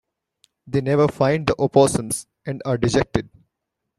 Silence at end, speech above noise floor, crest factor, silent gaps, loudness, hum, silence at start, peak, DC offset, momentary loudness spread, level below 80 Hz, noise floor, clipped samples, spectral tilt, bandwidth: 0.75 s; 61 dB; 20 dB; none; -20 LUFS; none; 0.65 s; -2 dBFS; under 0.1%; 11 LU; -46 dBFS; -80 dBFS; under 0.1%; -5.5 dB/octave; 14.5 kHz